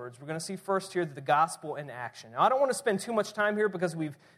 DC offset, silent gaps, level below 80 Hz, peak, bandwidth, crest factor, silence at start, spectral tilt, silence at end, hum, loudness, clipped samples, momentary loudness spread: under 0.1%; none; -80 dBFS; -12 dBFS; 15 kHz; 18 dB; 0 s; -4.5 dB/octave; 0.25 s; none; -30 LUFS; under 0.1%; 12 LU